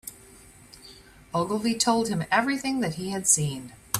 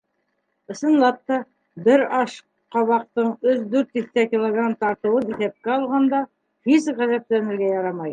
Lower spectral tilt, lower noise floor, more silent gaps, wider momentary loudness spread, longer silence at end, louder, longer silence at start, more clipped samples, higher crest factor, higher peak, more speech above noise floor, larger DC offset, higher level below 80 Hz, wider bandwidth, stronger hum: second, -3.5 dB/octave vs -6 dB/octave; second, -51 dBFS vs -72 dBFS; neither; first, 18 LU vs 8 LU; about the same, 0 s vs 0 s; second, -25 LUFS vs -21 LUFS; second, 0.05 s vs 0.7 s; neither; first, 22 dB vs 16 dB; about the same, -4 dBFS vs -4 dBFS; second, 25 dB vs 52 dB; neither; first, -58 dBFS vs -70 dBFS; first, 16 kHz vs 9.4 kHz; neither